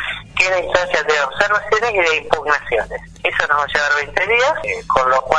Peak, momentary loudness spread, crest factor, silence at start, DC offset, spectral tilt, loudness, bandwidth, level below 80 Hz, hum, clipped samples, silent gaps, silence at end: 0 dBFS; 6 LU; 18 dB; 0 s; under 0.1%; -2.5 dB/octave; -16 LUFS; 10.5 kHz; -42 dBFS; none; under 0.1%; none; 0 s